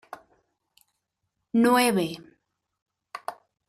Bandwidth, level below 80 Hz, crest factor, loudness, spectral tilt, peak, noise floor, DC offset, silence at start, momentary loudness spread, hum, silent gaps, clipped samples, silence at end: 15 kHz; -72 dBFS; 20 dB; -23 LUFS; -4.5 dB/octave; -8 dBFS; -80 dBFS; under 0.1%; 1.55 s; 25 LU; none; 2.82-2.86 s; under 0.1%; 0.35 s